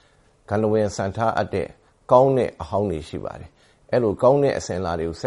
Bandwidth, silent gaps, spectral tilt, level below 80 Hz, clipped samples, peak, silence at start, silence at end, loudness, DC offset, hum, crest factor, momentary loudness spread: 11.5 kHz; none; -6.5 dB/octave; -48 dBFS; under 0.1%; -2 dBFS; 0.5 s; 0 s; -21 LUFS; under 0.1%; none; 20 dB; 15 LU